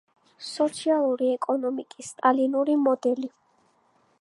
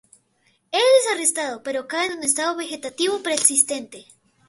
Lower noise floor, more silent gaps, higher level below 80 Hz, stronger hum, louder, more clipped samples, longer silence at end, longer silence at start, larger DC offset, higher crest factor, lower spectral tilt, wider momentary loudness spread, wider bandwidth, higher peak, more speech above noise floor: about the same, -65 dBFS vs -65 dBFS; neither; second, -82 dBFS vs -72 dBFS; neither; second, -25 LUFS vs -20 LUFS; neither; first, 0.9 s vs 0.45 s; second, 0.4 s vs 0.7 s; neither; about the same, 20 dB vs 22 dB; first, -3.5 dB/octave vs 0 dB/octave; about the same, 14 LU vs 12 LU; about the same, 11.5 kHz vs 12 kHz; second, -6 dBFS vs 0 dBFS; about the same, 41 dB vs 41 dB